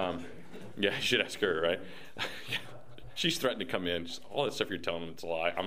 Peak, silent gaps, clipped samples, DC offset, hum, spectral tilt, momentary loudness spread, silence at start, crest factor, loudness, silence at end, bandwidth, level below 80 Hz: -12 dBFS; none; under 0.1%; 0.6%; none; -3.5 dB/octave; 18 LU; 0 s; 24 dB; -33 LUFS; 0 s; 15.5 kHz; -64 dBFS